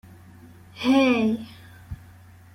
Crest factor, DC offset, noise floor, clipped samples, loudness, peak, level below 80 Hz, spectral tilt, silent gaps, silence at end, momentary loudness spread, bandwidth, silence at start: 18 dB; under 0.1%; -48 dBFS; under 0.1%; -22 LUFS; -8 dBFS; -52 dBFS; -5.5 dB/octave; none; 0.6 s; 23 LU; 15 kHz; 0.75 s